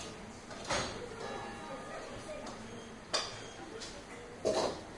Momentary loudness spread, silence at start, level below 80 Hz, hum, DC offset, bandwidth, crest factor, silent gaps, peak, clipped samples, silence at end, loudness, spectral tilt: 12 LU; 0 s; -60 dBFS; none; under 0.1%; 11.5 kHz; 22 dB; none; -18 dBFS; under 0.1%; 0 s; -40 LUFS; -3 dB/octave